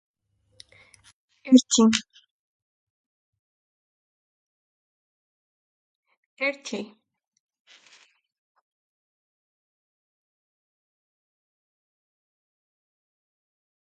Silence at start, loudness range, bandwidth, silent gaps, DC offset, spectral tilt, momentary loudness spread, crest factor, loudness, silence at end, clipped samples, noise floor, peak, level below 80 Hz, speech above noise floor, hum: 1.45 s; 12 LU; 9.4 kHz; 2.31-3.33 s, 3.39-6.03 s, 6.17-6.37 s; under 0.1%; -3 dB/octave; 21 LU; 28 dB; -21 LUFS; 7.1 s; under 0.1%; -58 dBFS; -2 dBFS; -74 dBFS; 38 dB; none